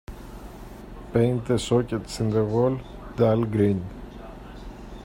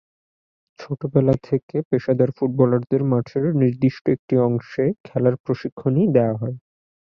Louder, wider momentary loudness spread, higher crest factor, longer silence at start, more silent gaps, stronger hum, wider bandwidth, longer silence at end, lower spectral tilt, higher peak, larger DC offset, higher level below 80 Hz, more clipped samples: second, -24 LUFS vs -21 LUFS; first, 20 LU vs 7 LU; about the same, 18 dB vs 18 dB; second, 0.1 s vs 0.8 s; second, none vs 1.63-1.69 s, 1.85-1.91 s, 4.01-4.05 s, 4.19-4.28 s, 5.00-5.04 s, 5.40-5.44 s, 5.72-5.77 s; neither; first, 16 kHz vs 6.2 kHz; second, 0 s vs 0.6 s; second, -7 dB/octave vs -10.5 dB/octave; second, -6 dBFS vs -2 dBFS; neither; first, -44 dBFS vs -56 dBFS; neither